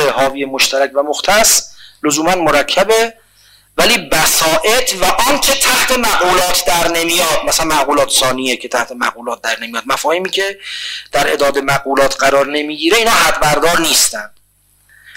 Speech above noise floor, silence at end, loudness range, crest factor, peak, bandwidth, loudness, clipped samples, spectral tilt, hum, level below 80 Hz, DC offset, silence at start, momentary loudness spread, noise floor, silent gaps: 41 dB; 0.05 s; 4 LU; 14 dB; 0 dBFS; 16.5 kHz; -12 LUFS; under 0.1%; -1.5 dB/octave; 50 Hz at -55 dBFS; -36 dBFS; under 0.1%; 0 s; 9 LU; -54 dBFS; none